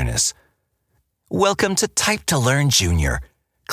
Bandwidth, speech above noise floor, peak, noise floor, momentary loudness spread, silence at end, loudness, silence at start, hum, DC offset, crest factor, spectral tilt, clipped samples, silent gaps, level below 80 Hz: 16 kHz; 49 dB; -4 dBFS; -68 dBFS; 7 LU; 0 s; -19 LUFS; 0 s; none; under 0.1%; 18 dB; -3.5 dB/octave; under 0.1%; none; -32 dBFS